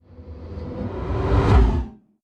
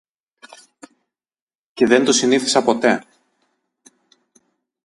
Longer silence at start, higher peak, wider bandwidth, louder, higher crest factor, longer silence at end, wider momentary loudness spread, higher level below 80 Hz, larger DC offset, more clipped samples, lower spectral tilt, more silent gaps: second, 0.2 s vs 1.75 s; second, -6 dBFS vs 0 dBFS; second, 7 kHz vs 11.5 kHz; second, -21 LUFS vs -16 LUFS; second, 16 dB vs 22 dB; second, 0.3 s vs 1.85 s; first, 20 LU vs 8 LU; first, -24 dBFS vs -64 dBFS; neither; neither; first, -8.5 dB/octave vs -3 dB/octave; neither